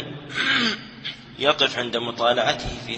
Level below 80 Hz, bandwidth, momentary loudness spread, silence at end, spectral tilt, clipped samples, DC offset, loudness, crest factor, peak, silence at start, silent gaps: -48 dBFS; 8.6 kHz; 12 LU; 0 s; -3.5 dB/octave; under 0.1%; under 0.1%; -22 LUFS; 22 dB; -2 dBFS; 0 s; none